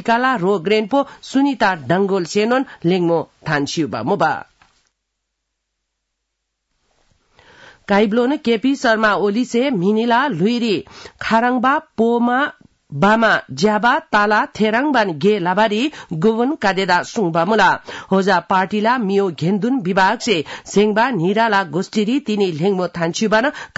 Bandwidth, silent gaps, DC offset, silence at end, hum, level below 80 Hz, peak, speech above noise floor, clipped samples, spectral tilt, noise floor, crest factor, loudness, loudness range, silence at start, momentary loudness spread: 8 kHz; none; under 0.1%; 0.1 s; none; -56 dBFS; -4 dBFS; 59 dB; under 0.1%; -5.5 dB/octave; -76 dBFS; 14 dB; -17 LUFS; 6 LU; 0 s; 5 LU